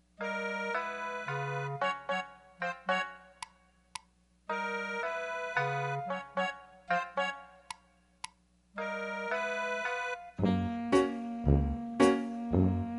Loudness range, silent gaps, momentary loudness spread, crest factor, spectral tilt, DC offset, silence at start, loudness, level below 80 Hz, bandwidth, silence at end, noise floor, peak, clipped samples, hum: 7 LU; none; 18 LU; 22 dB; -6 dB/octave; under 0.1%; 0.2 s; -33 LUFS; -46 dBFS; 11.5 kHz; 0 s; -67 dBFS; -12 dBFS; under 0.1%; 60 Hz at -70 dBFS